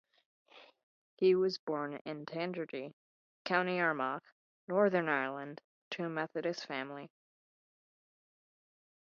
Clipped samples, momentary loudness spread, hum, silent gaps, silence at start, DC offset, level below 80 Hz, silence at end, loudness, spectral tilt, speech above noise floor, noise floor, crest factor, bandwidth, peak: under 0.1%; 16 LU; none; 0.83-1.17 s, 1.59-1.67 s, 2.01-2.05 s, 2.93-3.45 s, 4.32-4.67 s, 5.64-5.91 s; 0.55 s; under 0.1%; -86 dBFS; 1.95 s; -35 LUFS; -3.5 dB/octave; over 56 dB; under -90 dBFS; 22 dB; 7 kHz; -16 dBFS